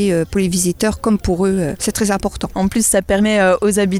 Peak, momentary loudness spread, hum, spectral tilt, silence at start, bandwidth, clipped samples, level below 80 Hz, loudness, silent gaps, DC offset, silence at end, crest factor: -4 dBFS; 5 LU; none; -4.5 dB/octave; 0 s; 15.5 kHz; under 0.1%; -34 dBFS; -16 LUFS; none; under 0.1%; 0 s; 12 dB